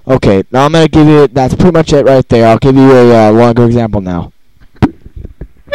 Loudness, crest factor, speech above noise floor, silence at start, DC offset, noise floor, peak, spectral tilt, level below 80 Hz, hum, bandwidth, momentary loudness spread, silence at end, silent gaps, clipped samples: -7 LUFS; 8 dB; 36 dB; 0.05 s; under 0.1%; -41 dBFS; 0 dBFS; -7.5 dB/octave; -28 dBFS; none; 12.5 kHz; 10 LU; 0 s; none; 0.8%